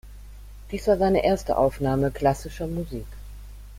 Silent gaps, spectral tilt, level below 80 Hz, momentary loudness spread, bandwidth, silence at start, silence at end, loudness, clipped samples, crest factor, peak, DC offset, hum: none; -7 dB/octave; -40 dBFS; 21 LU; 16.5 kHz; 0.05 s; 0 s; -24 LUFS; under 0.1%; 18 dB; -8 dBFS; under 0.1%; 50 Hz at -40 dBFS